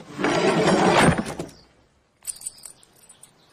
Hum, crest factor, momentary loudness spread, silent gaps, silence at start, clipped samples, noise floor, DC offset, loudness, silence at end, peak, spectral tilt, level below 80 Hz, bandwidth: none; 18 dB; 22 LU; none; 0 s; under 0.1%; -61 dBFS; under 0.1%; -20 LUFS; 1.05 s; -4 dBFS; -4.5 dB/octave; -48 dBFS; 15.5 kHz